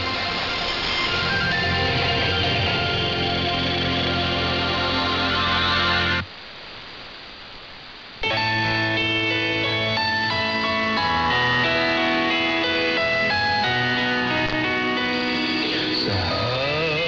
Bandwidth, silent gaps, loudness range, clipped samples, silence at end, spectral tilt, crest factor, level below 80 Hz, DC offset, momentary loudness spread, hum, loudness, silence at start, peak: 6 kHz; none; 4 LU; under 0.1%; 0 s; -5 dB/octave; 14 dB; -46 dBFS; under 0.1%; 11 LU; none; -20 LUFS; 0 s; -8 dBFS